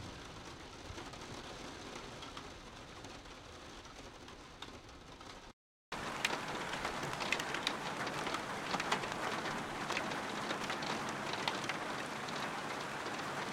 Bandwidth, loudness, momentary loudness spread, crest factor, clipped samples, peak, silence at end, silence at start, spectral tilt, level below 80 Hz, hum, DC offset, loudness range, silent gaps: 16.5 kHz; -40 LUFS; 15 LU; 26 dB; under 0.1%; -16 dBFS; 0 s; 0 s; -3 dB/octave; -64 dBFS; none; under 0.1%; 12 LU; 5.53-5.92 s